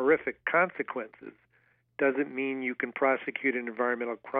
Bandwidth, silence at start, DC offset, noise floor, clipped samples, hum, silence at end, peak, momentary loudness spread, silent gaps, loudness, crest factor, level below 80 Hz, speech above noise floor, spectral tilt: 3.9 kHz; 0 s; under 0.1%; -69 dBFS; under 0.1%; none; 0 s; -10 dBFS; 14 LU; none; -29 LUFS; 20 dB; -76 dBFS; 38 dB; -3.5 dB/octave